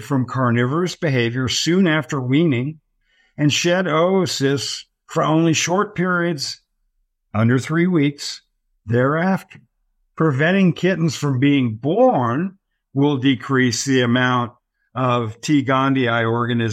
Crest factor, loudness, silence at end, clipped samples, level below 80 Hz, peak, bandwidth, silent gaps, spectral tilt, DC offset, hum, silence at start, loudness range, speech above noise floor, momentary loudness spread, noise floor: 14 dB; -19 LUFS; 0 s; under 0.1%; -60 dBFS; -4 dBFS; 15 kHz; none; -5.5 dB/octave; under 0.1%; none; 0 s; 3 LU; 50 dB; 9 LU; -68 dBFS